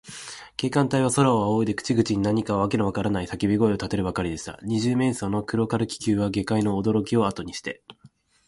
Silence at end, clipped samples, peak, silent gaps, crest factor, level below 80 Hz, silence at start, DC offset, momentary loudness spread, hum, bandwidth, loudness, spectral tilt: 0.4 s; under 0.1%; -6 dBFS; none; 18 dB; -48 dBFS; 0.05 s; under 0.1%; 11 LU; none; 11.5 kHz; -24 LUFS; -6 dB/octave